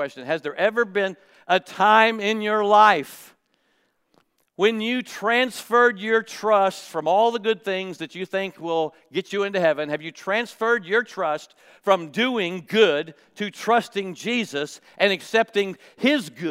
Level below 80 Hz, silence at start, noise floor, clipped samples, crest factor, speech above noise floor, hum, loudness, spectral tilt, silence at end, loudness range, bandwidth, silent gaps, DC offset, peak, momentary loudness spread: -82 dBFS; 0 s; -68 dBFS; under 0.1%; 22 dB; 46 dB; none; -22 LUFS; -4 dB/octave; 0 s; 4 LU; 16 kHz; none; under 0.1%; -2 dBFS; 11 LU